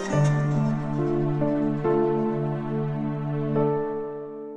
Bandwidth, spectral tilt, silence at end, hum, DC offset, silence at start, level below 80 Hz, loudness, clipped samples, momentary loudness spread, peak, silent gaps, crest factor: 9.2 kHz; -8.5 dB/octave; 0 s; none; under 0.1%; 0 s; -50 dBFS; -25 LUFS; under 0.1%; 6 LU; -10 dBFS; none; 14 dB